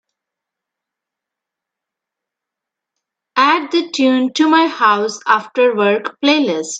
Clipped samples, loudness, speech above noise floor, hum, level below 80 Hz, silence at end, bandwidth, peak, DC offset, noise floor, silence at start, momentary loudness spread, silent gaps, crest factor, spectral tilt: under 0.1%; -14 LUFS; 69 dB; none; -76 dBFS; 0 s; 9.2 kHz; 0 dBFS; under 0.1%; -83 dBFS; 3.35 s; 4 LU; none; 18 dB; -3.5 dB/octave